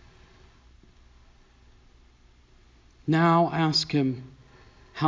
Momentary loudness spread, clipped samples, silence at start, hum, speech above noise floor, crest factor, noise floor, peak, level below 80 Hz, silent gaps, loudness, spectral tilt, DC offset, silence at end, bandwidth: 17 LU; under 0.1%; 3.05 s; 60 Hz at -60 dBFS; 34 dB; 18 dB; -57 dBFS; -10 dBFS; -58 dBFS; none; -24 LUFS; -6 dB/octave; under 0.1%; 0 s; 7.6 kHz